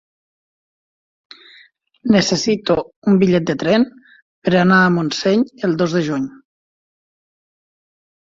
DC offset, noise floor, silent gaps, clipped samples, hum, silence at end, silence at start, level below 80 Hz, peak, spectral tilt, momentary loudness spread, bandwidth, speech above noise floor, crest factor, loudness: under 0.1%; -50 dBFS; 2.96-3.02 s, 4.22-4.42 s; under 0.1%; none; 1.95 s; 2.05 s; -54 dBFS; -2 dBFS; -5.5 dB/octave; 10 LU; 7.6 kHz; 35 dB; 18 dB; -16 LUFS